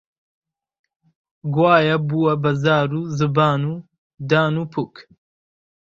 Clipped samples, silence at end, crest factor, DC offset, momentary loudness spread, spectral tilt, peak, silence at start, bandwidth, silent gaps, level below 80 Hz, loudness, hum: under 0.1%; 0.95 s; 20 dB; under 0.1%; 15 LU; -7.5 dB/octave; 0 dBFS; 1.45 s; 7.4 kHz; 3.98-4.10 s; -58 dBFS; -19 LUFS; none